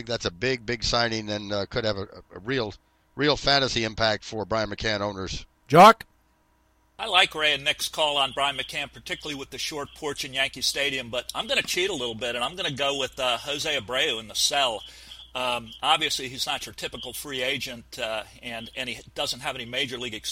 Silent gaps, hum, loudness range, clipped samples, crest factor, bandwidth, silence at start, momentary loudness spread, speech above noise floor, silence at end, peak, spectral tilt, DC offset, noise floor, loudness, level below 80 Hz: none; none; 7 LU; under 0.1%; 22 dB; 16 kHz; 0 s; 13 LU; 39 dB; 0 s; -4 dBFS; -3 dB/octave; under 0.1%; -64 dBFS; -25 LUFS; -50 dBFS